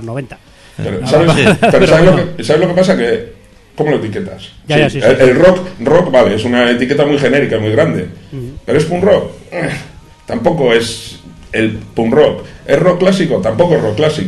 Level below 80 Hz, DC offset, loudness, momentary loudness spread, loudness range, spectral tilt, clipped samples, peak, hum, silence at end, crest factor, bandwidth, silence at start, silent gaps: -36 dBFS; under 0.1%; -11 LUFS; 16 LU; 5 LU; -6 dB/octave; 0.2%; 0 dBFS; none; 0 s; 12 dB; 12.5 kHz; 0 s; none